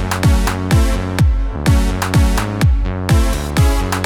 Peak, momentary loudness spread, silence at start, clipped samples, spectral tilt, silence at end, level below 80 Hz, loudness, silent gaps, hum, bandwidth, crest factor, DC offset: -2 dBFS; 2 LU; 0 s; under 0.1%; -5.5 dB/octave; 0 s; -16 dBFS; -16 LUFS; none; none; 18.5 kHz; 12 dB; under 0.1%